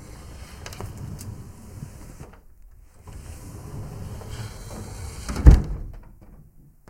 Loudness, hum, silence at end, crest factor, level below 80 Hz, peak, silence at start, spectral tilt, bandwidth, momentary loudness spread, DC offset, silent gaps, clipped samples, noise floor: -25 LUFS; none; 0.45 s; 26 dB; -28 dBFS; 0 dBFS; 0 s; -7 dB/octave; 15.5 kHz; 26 LU; under 0.1%; none; under 0.1%; -50 dBFS